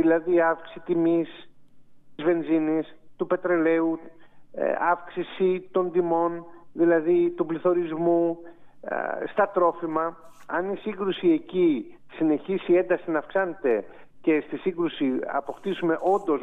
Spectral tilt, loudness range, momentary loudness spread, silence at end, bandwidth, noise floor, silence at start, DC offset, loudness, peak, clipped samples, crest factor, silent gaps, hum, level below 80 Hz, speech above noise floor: -8.5 dB/octave; 2 LU; 9 LU; 0 s; 3.9 kHz; -47 dBFS; 0 s; under 0.1%; -25 LUFS; -10 dBFS; under 0.1%; 16 dB; none; none; -68 dBFS; 23 dB